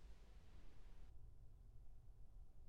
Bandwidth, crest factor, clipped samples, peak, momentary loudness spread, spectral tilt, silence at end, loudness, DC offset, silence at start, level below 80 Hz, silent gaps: 9.2 kHz; 10 dB; under 0.1%; -46 dBFS; 2 LU; -6 dB/octave; 0 s; -68 LUFS; under 0.1%; 0 s; -62 dBFS; none